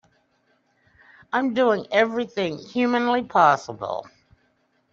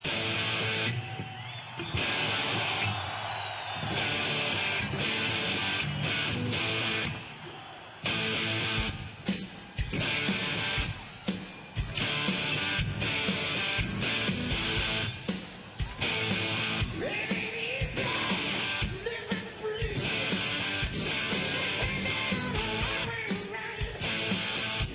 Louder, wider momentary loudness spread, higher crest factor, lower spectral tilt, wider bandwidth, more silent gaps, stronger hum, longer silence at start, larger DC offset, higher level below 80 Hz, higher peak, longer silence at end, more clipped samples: first, -22 LUFS vs -30 LUFS; first, 13 LU vs 8 LU; about the same, 20 dB vs 16 dB; about the same, -3 dB/octave vs -2.5 dB/octave; first, 7.4 kHz vs 4 kHz; neither; neither; first, 1.35 s vs 0 s; neither; second, -68 dBFS vs -46 dBFS; first, -4 dBFS vs -16 dBFS; first, 0.9 s vs 0 s; neither